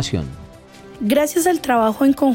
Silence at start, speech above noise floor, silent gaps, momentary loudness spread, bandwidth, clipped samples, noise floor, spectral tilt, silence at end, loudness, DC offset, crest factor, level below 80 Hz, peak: 0 s; 24 dB; none; 13 LU; 16.5 kHz; under 0.1%; -41 dBFS; -5 dB/octave; 0 s; -18 LUFS; under 0.1%; 12 dB; -44 dBFS; -6 dBFS